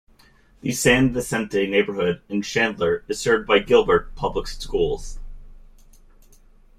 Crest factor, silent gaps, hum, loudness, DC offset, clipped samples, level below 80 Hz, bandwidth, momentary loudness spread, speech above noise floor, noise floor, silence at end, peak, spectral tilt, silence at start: 20 dB; none; none; -21 LUFS; under 0.1%; under 0.1%; -38 dBFS; 16 kHz; 11 LU; 33 dB; -54 dBFS; 1.2 s; -2 dBFS; -4.5 dB/octave; 0.65 s